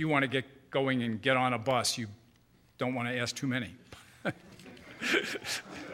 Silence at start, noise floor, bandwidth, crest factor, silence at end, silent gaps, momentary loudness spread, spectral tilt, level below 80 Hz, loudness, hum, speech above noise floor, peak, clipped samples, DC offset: 0 s; -64 dBFS; 16 kHz; 22 dB; 0 s; none; 20 LU; -4 dB/octave; -68 dBFS; -32 LUFS; none; 32 dB; -12 dBFS; under 0.1%; under 0.1%